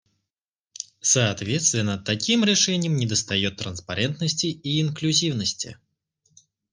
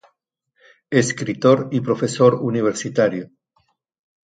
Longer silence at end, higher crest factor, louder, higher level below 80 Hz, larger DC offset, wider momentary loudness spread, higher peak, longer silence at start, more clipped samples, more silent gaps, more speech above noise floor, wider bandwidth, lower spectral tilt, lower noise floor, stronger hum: about the same, 1 s vs 1.05 s; about the same, 20 dB vs 20 dB; second, -22 LUFS vs -19 LUFS; about the same, -62 dBFS vs -62 dBFS; neither; first, 10 LU vs 6 LU; second, -6 dBFS vs 0 dBFS; about the same, 0.8 s vs 0.9 s; neither; neither; first, 66 dB vs 53 dB; first, 10.5 kHz vs 9.4 kHz; second, -3 dB/octave vs -5.5 dB/octave; first, -89 dBFS vs -71 dBFS; neither